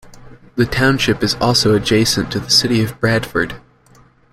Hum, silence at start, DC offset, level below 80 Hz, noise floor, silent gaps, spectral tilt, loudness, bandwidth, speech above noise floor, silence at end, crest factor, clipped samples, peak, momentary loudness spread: none; 0.05 s; under 0.1%; -40 dBFS; -49 dBFS; none; -4 dB/octave; -15 LUFS; 16 kHz; 34 dB; 0.75 s; 16 dB; under 0.1%; 0 dBFS; 8 LU